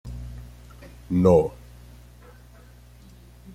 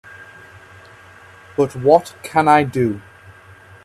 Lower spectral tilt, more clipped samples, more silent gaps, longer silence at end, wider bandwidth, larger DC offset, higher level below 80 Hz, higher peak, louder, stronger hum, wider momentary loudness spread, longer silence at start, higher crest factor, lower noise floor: first, -9 dB/octave vs -6.5 dB/octave; neither; neither; first, 2.05 s vs 0.85 s; about the same, 15 kHz vs 14.5 kHz; neither; first, -44 dBFS vs -56 dBFS; second, -4 dBFS vs 0 dBFS; second, -21 LUFS vs -17 LUFS; first, 60 Hz at -45 dBFS vs none; first, 28 LU vs 19 LU; second, 0.05 s vs 0.2 s; about the same, 22 dB vs 20 dB; first, -48 dBFS vs -44 dBFS